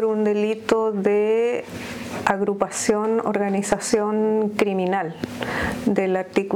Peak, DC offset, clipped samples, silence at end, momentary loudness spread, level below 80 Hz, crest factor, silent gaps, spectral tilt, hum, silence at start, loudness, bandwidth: -6 dBFS; under 0.1%; under 0.1%; 0 s; 6 LU; -52 dBFS; 16 dB; none; -5 dB/octave; none; 0 s; -22 LUFS; 17.5 kHz